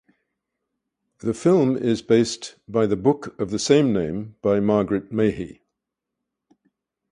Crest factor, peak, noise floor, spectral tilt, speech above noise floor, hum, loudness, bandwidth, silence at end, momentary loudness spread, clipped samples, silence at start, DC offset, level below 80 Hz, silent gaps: 20 dB; -4 dBFS; -83 dBFS; -6 dB/octave; 62 dB; none; -21 LUFS; 11 kHz; 1.6 s; 11 LU; under 0.1%; 1.25 s; under 0.1%; -54 dBFS; none